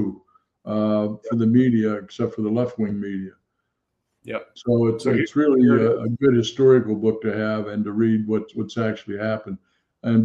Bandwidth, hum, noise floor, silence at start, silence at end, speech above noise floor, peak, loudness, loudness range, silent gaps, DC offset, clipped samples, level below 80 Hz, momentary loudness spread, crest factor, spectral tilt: 9 kHz; none; -77 dBFS; 0 s; 0 s; 56 dB; -4 dBFS; -21 LUFS; 6 LU; none; under 0.1%; under 0.1%; -60 dBFS; 14 LU; 18 dB; -8 dB/octave